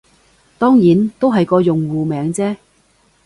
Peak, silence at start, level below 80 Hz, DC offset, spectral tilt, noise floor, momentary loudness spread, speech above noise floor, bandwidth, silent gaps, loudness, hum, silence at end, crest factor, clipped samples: 0 dBFS; 0.6 s; -52 dBFS; under 0.1%; -7.5 dB/octave; -56 dBFS; 9 LU; 42 dB; 11.5 kHz; none; -15 LUFS; none; 0.7 s; 14 dB; under 0.1%